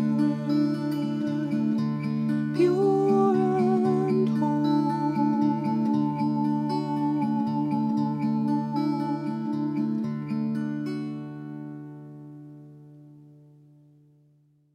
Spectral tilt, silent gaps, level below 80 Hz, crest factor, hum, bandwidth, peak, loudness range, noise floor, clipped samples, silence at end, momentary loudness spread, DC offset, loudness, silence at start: -9 dB/octave; none; -72 dBFS; 14 dB; none; 9.4 kHz; -12 dBFS; 12 LU; -62 dBFS; under 0.1%; 1.45 s; 15 LU; under 0.1%; -26 LUFS; 0 s